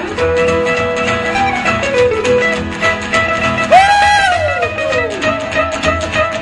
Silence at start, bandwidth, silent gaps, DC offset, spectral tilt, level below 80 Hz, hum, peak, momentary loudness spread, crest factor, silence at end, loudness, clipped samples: 0 s; 11.5 kHz; none; under 0.1%; -4 dB/octave; -34 dBFS; none; 0 dBFS; 7 LU; 14 dB; 0 s; -13 LUFS; under 0.1%